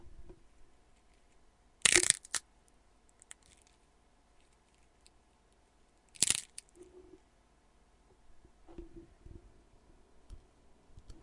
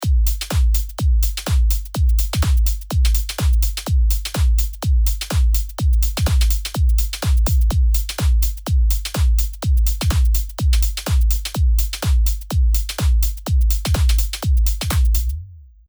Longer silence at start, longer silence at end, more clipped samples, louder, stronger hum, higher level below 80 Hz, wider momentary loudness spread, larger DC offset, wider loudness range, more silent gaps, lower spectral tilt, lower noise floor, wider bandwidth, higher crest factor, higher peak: about the same, 0.05 s vs 0 s; second, 0.1 s vs 0.3 s; neither; second, -29 LUFS vs -19 LUFS; neither; second, -62 dBFS vs -18 dBFS; first, 31 LU vs 2 LU; neither; first, 7 LU vs 1 LU; neither; second, 0 dB/octave vs -4.5 dB/octave; first, -68 dBFS vs -37 dBFS; second, 12 kHz vs over 20 kHz; first, 40 dB vs 12 dB; first, 0 dBFS vs -6 dBFS